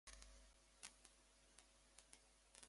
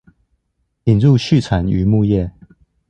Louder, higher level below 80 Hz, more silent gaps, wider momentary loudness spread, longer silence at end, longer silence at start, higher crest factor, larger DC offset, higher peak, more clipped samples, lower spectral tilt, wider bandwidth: second, -65 LUFS vs -15 LUFS; second, -74 dBFS vs -34 dBFS; neither; about the same, 8 LU vs 8 LU; second, 0 s vs 0.6 s; second, 0.05 s vs 0.85 s; first, 34 dB vs 14 dB; neither; second, -34 dBFS vs -2 dBFS; neither; second, -1 dB/octave vs -8 dB/octave; first, 11.5 kHz vs 8.8 kHz